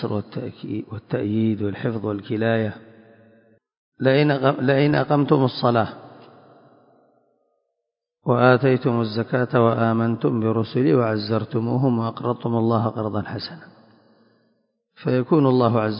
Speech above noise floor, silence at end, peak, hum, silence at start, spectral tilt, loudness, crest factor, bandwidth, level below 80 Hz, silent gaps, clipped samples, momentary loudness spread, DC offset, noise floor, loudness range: 62 dB; 0 s; -2 dBFS; none; 0 s; -12 dB/octave; -21 LUFS; 20 dB; 5.4 kHz; -58 dBFS; 3.77-3.92 s; under 0.1%; 12 LU; under 0.1%; -82 dBFS; 5 LU